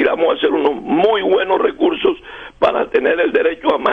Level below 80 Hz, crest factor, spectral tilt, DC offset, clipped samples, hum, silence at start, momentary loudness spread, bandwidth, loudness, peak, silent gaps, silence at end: -48 dBFS; 14 dB; -6.5 dB/octave; under 0.1%; under 0.1%; none; 0 s; 4 LU; 5.8 kHz; -16 LUFS; -2 dBFS; none; 0 s